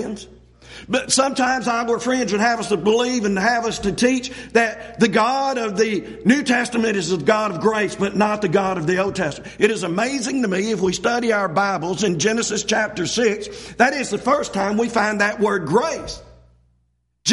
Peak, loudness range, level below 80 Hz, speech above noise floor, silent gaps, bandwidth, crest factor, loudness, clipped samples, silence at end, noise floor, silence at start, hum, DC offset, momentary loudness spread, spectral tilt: -2 dBFS; 1 LU; -50 dBFS; 47 dB; none; 11.5 kHz; 18 dB; -20 LUFS; under 0.1%; 0 s; -66 dBFS; 0 s; none; under 0.1%; 5 LU; -4 dB/octave